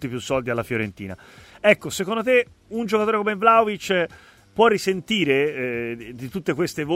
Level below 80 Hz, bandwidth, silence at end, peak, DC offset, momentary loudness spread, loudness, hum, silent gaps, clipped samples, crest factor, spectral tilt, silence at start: -56 dBFS; 16 kHz; 0 s; -2 dBFS; under 0.1%; 13 LU; -22 LUFS; none; none; under 0.1%; 20 dB; -5 dB/octave; 0 s